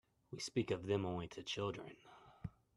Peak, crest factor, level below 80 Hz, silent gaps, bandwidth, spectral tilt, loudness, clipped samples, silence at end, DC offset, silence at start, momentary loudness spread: -24 dBFS; 20 dB; -70 dBFS; none; 12.5 kHz; -5 dB/octave; -42 LUFS; under 0.1%; 0.25 s; under 0.1%; 0.3 s; 17 LU